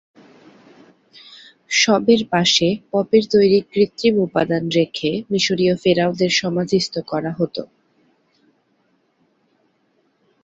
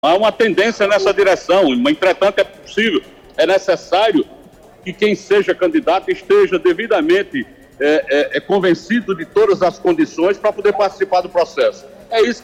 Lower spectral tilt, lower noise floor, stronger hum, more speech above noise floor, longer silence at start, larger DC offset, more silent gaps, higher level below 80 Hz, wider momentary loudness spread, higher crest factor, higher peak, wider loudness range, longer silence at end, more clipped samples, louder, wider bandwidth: about the same, -4.5 dB/octave vs -4.5 dB/octave; first, -64 dBFS vs -43 dBFS; neither; first, 46 dB vs 28 dB; first, 1.3 s vs 0.05 s; neither; neither; second, -58 dBFS vs -52 dBFS; about the same, 8 LU vs 6 LU; first, 18 dB vs 10 dB; first, -2 dBFS vs -6 dBFS; first, 10 LU vs 2 LU; first, 2.8 s vs 0.05 s; neither; second, -18 LUFS vs -15 LUFS; second, 8 kHz vs 12.5 kHz